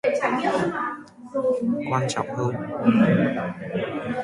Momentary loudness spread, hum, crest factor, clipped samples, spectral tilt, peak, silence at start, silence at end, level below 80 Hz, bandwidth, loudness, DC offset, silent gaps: 10 LU; none; 18 dB; under 0.1%; -6.5 dB/octave; -6 dBFS; 0.05 s; 0 s; -60 dBFS; 11.5 kHz; -24 LUFS; under 0.1%; none